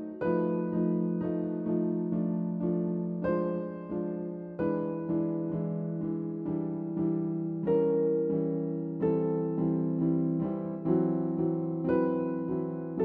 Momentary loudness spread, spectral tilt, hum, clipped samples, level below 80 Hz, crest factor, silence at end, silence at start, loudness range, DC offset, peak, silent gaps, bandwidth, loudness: 6 LU; -11 dB/octave; none; under 0.1%; -62 dBFS; 14 dB; 0 s; 0 s; 3 LU; under 0.1%; -16 dBFS; none; 3.2 kHz; -31 LUFS